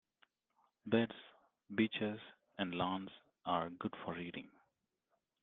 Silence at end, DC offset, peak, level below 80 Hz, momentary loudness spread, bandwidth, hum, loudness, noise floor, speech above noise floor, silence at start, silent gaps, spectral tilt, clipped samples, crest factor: 0.95 s; under 0.1%; -20 dBFS; -78 dBFS; 16 LU; 4.2 kHz; none; -40 LUFS; -85 dBFS; 46 dB; 0.85 s; none; -4 dB/octave; under 0.1%; 24 dB